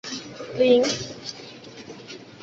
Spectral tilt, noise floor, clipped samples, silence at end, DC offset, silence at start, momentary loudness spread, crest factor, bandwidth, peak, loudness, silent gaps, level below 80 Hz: -3.5 dB/octave; -42 dBFS; under 0.1%; 0 s; under 0.1%; 0.05 s; 22 LU; 20 dB; 8 kHz; -6 dBFS; -23 LUFS; none; -62 dBFS